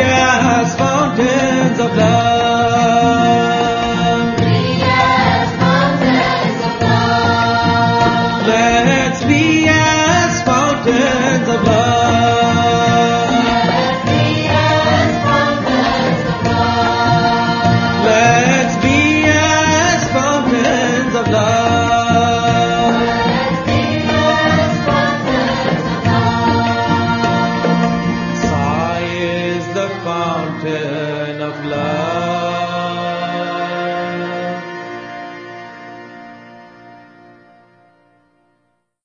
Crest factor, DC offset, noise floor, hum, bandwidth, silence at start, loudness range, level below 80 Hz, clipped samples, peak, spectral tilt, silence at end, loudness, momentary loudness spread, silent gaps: 14 dB; under 0.1%; -65 dBFS; none; 7.2 kHz; 0 s; 7 LU; -38 dBFS; under 0.1%; 0 dBFS; -5 dB/octave; 2.15 s; -14 LUFS; 9 LU; none